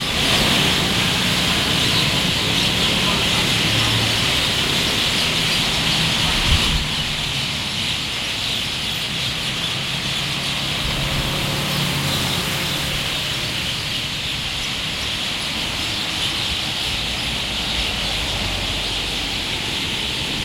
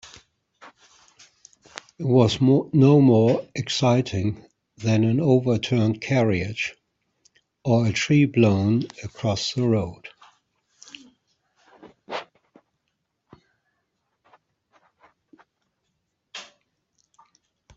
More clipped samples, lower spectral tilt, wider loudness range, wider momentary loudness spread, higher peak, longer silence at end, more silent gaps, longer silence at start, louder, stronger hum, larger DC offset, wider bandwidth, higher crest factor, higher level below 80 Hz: neither; second, -2.5 dB/octave vs -6.5 dB/octave; second, 5 LU vs 23 LU; second, 5 LU vs 23 LU; about the same, -4 dBFS vs -6 dBFS; second, 0 s vs 1.35 s; neither; second, 0 s vs 0.65 s; about the same, -19 LUFS vs -21 LUFS; neither; neither; first, 16.5 kHz vs 7.8 kHz; about the same, 18 dB vs 18 dB; first, -34 dBFS vs -60 dBFS